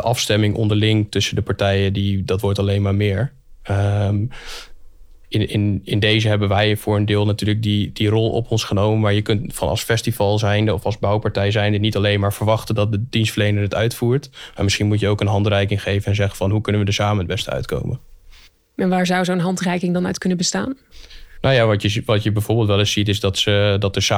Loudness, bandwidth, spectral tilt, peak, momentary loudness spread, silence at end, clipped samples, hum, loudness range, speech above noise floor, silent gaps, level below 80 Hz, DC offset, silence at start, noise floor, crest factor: -19 LUFS; 15.5 kHz; -5.5 dB/octave; -4 dBFS; 7 LU; 0 s; under 0.1%; none; 3 LU; 28 dB; none; -44 dBFS; under 0.1%; 0 s; -46 dBFS; 14 dB